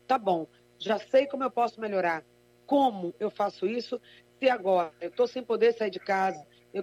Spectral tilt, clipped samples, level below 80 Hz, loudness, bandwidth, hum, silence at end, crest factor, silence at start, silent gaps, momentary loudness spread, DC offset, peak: -5.5 dB/octave; under 0.1%; -78 dBFS; -28 LUFS; 12.5 kHz; 60 Hz at -60 dBFS; 0 s; 16 dB; 0.1 s; none; 10 LU; under 0.1%; -12 dBFS